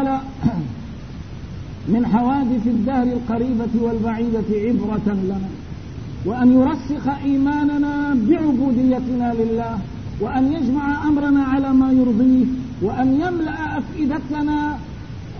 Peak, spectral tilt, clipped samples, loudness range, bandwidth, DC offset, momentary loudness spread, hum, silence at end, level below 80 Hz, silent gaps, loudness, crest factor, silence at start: -4 dBFS; -8.5 dB/octave; under 0.1%; 3 LU; 6.4 kHz; 0.6%; 15 LU; none; 0 s; -38 dBFS; none; -19 LUFS; 16 dB; 0 s